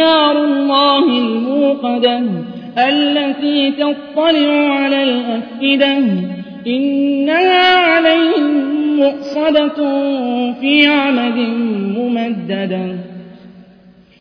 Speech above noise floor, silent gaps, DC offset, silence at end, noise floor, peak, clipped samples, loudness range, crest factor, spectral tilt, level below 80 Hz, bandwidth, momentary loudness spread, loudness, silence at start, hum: 31 dB; none; under 0.1%; 0.6 s; -44 dBFS; 0 dBFS; under 0.1%; 3 LU; 14 dB; -7 dB/octave; -60 dBFS; 5.4 kHz; 10 LU; -14 LUFS; 0 s; none